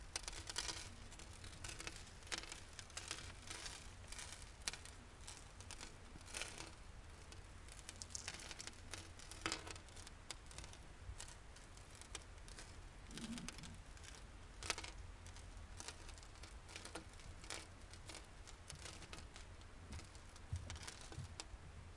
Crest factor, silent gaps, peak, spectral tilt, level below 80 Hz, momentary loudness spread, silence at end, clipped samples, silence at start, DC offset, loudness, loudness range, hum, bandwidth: 30 dB; none; -22 dBFS; -2.5 dB/octave; -60 dBFS; 11 LU; 0 s; under 0.1%; 0 s; under 0.1%; -52 LUFS; 4 LU; none; 11.5 kHz